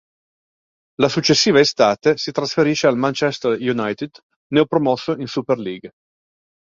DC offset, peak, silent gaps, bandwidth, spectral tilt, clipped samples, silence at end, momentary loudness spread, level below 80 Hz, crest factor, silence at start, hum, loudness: under 0.1%; -2 dBFS; 4.23-4.30 s, 4.36-4.50 s; 7.6 kHz; -4.5 dB/octave; under 0.1%; 0.8 s; 10 LU; -58 dBFS; 18 dB; 1 s; none; -18 LUFS